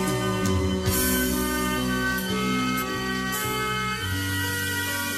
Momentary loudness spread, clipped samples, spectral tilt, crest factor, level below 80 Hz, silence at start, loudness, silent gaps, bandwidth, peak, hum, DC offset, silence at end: 4 LU; under 0.1%; -4 dB/octave; 14 dB; -40 dBFS; 0 s; -25 LUFS; none; 15.5 kHz; -12 dBFS; none; under 0.1%; 0 s